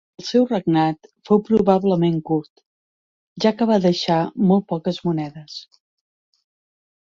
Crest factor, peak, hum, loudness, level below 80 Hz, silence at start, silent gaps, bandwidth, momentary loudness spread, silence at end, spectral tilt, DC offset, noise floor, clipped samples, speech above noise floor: 18 dB; -2 dBFS; none; -19 LUFS; -58 dBFS; 0.2 s; 2.50-2.56 s, 2.66-3.36 s; 7.4 kHz; 10 LU; 1.5 s; -7 dB/octave; under 0.1%; under -90 dBFS; under 0.1%; over 71 dB